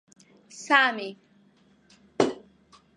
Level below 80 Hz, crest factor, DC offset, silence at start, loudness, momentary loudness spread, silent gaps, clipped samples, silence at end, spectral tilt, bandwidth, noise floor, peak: -74 dBFS; 26 dB; under 0.1%; 0.55 s; -24 LUFS; 26 LU; none; under 0.1%; 0.6 s; -3 dB/octave; 11 kHz; -61 dBFS; -4 dBFS